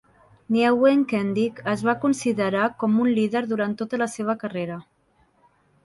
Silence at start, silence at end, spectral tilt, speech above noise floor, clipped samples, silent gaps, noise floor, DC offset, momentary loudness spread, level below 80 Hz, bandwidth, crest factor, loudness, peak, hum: 0.5 s; 1.05 s; -6 dB/octave; 41 dB; under 0.1%; none; -63 dBFS; under 0.1%; 9 LU; -66 dBFS; 11.5 kHz; 16 dB; -23 LUFS; -6 dBFS; none